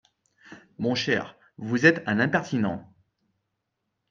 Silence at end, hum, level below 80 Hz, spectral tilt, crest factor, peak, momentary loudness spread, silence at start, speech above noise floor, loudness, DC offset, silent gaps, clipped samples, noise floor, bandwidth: 1.3 s; none; -70 dBFS; -5.5 dB/octave; 24 dB; -4 dBFS; 17 LU; 0.5 s; 56 dB; -24 LUFS; under 0.1%; none; under 0.1%; -80 dBFS; 7.6 kHz